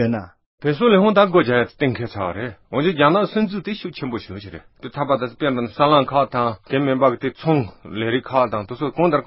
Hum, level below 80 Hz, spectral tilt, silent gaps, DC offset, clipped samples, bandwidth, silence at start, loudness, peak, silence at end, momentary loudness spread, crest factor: none; -52 dBFS; -11.5 dB/octave; 0.46-0.58 s; under 0.1%; under 0.1%; 5.8 kHz; 0 s; -19 LUFS; 0 dBFS; 0 s; 13 LU; 18 dB